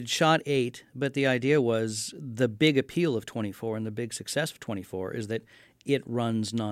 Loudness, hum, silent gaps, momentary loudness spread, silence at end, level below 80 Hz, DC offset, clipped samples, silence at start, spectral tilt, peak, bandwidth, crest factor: -28 LUFS; none; none; 11 LU; 0 s; -68 dBFS; under 0.1%; under 0.1%; 0 s; -5 dB/octave; -8 dBFS; 16 kHz; 20 dB